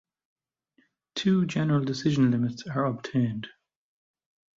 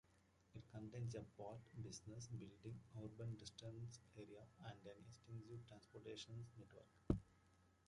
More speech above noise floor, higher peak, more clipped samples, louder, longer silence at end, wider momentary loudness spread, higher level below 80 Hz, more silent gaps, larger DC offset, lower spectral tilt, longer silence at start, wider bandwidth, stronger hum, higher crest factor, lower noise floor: first, 43 dB vs 23 dB; first, -12 dBFS vs -26 dBFS; neither; first, -26 LUFS vs -55 LUFS; first, 1.1 s vs 0.1 s; second, 10 LU vs 13 LU; about the same, -64 dBFS vs -66 dBFS; neither; neither; about the same, -7 dB/octave vs -6 dB/octave; first, 1.15 s vs 0.05 s; second, 7.8 kHz vs 11 kHz; neither; second, 16 dB vs 30 dB; second, -69 dBFS vs -77 dBFS